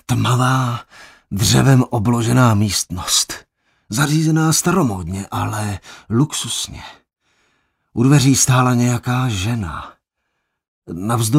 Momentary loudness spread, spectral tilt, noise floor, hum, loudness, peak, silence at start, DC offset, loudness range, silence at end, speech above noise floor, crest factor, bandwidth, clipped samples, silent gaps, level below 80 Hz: 15 LU; -4.5 dB/octave; -73 dBFS; none; -16 LUFS; 0 dBFS; 0.1 s; under 0.1%; 4 LU; 0 s; 57 dB; 16 dB; 16 kHz; under 0.1%; 10.68-10.82 s; -44 dBFS